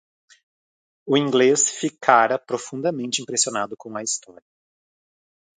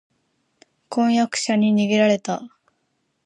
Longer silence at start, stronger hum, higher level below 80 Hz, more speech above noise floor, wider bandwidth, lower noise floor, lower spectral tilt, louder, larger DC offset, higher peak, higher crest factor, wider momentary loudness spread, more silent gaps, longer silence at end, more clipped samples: first, 1.05 s vs 0.9 s; neither; about the same, -74 dBFS vs -70 dBFS; first, over 69 dB vs 52 dB; second, 9.6 kHz vs 11 kHz; first, under -90 dBFS vs -71 dBFS; second, -2.5 dB/octave vs -5 dB/octave; about the same, -21 LUFS vs -20 LUFS; neither; first, 0 dBFS vs -6 dBFS; first, 24 dB vs 16 dB; about the same, 12 LU vs 11 LU; neither; first, 1.25 s vs 0.8 s; neither